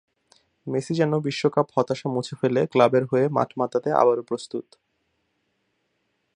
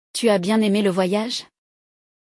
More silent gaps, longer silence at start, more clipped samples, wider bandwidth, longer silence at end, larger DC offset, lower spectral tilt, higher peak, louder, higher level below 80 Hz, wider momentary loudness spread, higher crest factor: neither; first, 0.65 s vs 0.15 s; neither; second, 10.5 kHz vs 12 kHz; first, 1.75 s vs 0.8 s; neither; first, -6.5 dB/octave vs -5 dB/octave; first, -2 dBFS vs -6 dBFS; second, -23 LUFS vs -20 LUFS; about the same, -68 dBFS vs -68 dBFS; first, 11 LU vs 8 LU; first, 22 dB vs 14 dB